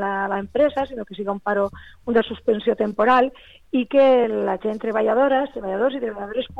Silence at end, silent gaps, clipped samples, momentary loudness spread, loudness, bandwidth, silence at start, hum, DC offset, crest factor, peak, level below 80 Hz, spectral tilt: 0 s; none; under 0.1%; 11 LU; -21 LUFS; 5.6 kHz; 0 s; none; 0.3%; 14 dB; -6 dBFS; -52 dBFS; -7 dB/octave